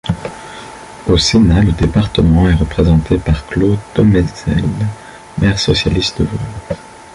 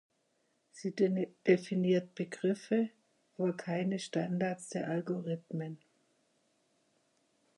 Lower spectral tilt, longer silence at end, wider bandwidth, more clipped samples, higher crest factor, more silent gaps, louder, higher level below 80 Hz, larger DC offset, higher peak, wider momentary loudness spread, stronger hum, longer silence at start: about the same, -6 dB/octave vs -6.5 dB/octave; second, 0.15 s vs 1.8 s; about the same, 11.5 kHz vs 11.5 kHz; neither; second, 12 dB vs 22 dB; neither; first, -14 LUFS vs -34 LUFS; first, -24 dBFS vs -84 dBFS; neither; first, -2 dBFS vs -12 dBFS; first, 16 LU vs 11 LU; neither; second, 0.05 s vs 0.75 s